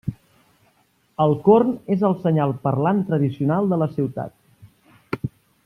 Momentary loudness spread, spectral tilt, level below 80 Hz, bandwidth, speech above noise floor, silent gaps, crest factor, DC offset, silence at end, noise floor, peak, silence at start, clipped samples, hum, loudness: 17 LU; -10 dB/octave; -56 dBFS; 5.6 kHz; 43 dB; none; 18 dB; under 0.1%; 0.35 s; -62 dBFS; -4 dBFS; 0.05 s; under 0.1%; none; -20 LUFS